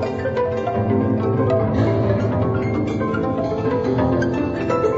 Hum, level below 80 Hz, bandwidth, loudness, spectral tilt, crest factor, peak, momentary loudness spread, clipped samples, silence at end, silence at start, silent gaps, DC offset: none; -40 dBFS; 7.6 kHz; -20 LUFS; -9 dB/octave; 14 dB; -6 dBFS; 3 LU; under 0.1%; 0 s; 0 s; none; under 0.1%